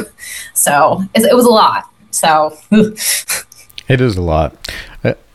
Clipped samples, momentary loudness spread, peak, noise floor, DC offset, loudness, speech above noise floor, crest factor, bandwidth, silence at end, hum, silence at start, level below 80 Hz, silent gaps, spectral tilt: under 0.1%; 17 LU; 0 dBFS; -35 dBFS; under 0.1%; -12 LUFS; 23 dB; 12 dB; 15 kHz; 0.2 s; none; 0 s; -36 dBFS; none; -4 dB/octave